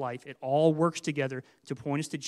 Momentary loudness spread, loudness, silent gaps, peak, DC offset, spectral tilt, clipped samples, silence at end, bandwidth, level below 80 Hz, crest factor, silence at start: 14 LU; -29 LUFS; none; -10 dBFS; under 0.1%; -6 dB/octave; under 0.1%; 0 s; 13 kHz; -76 dBFS; 20 dB; 0 s